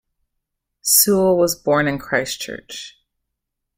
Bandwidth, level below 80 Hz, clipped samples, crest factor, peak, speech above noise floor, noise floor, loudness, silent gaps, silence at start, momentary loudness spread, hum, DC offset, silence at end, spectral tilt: 16.5 kHz; -54 dBFS; under 0.1%; 20 dB; 0 dBFS; 61 dB; -79 dBFS; -17 LUFS; none; 0.85 s; 20 LU; none; under 0.1%; 0.9 s; -3 dB/octave